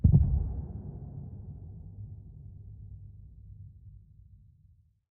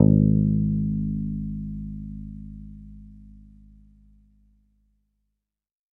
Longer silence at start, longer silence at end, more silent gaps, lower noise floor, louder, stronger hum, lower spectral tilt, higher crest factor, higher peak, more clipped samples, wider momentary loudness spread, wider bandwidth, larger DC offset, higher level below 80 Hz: about the same, 0.05 s vs 0 s; second, 1.2 s vs 2.65 s; neither; second, -63 dBFS vs -83 dBFS; second, -34 LUFS vs -25 LUFS; neither; first, -16.5 dB/octave vs -15 dB/octave; about the same, 24 dB vs 24 dB; second, -10 dBFS vs -2 dBFS; neither; second, 22 LU vs 25 LU; first, 1.3 kHz vs 1 kHz; neither; about the same, -38 dBFS vs -40 dBFS